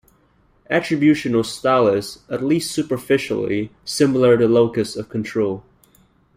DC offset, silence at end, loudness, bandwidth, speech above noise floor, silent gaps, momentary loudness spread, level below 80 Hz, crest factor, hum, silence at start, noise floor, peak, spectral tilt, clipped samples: under 0.1%; 0.75 s; -19 LUFS; 16 kHz; 40 dB; none; 10 LU; -54 dBFS; 16 dB; none; 0.7 s; -58 dBFS; -4 dBFS; -5.5 dB/octave; under 0.1%